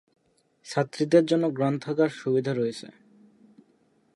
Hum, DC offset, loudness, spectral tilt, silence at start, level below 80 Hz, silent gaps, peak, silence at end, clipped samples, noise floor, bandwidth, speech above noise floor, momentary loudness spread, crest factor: none; under 0.1%; -25 LUFS; -6.5 dB/octave; 0.65 s; -76 dBFS; none; -8 dBFS; 1.3 s; under 0.1%; -65 dBFS; 11.5 kHz; 40 dB; 10 LU; 20 dB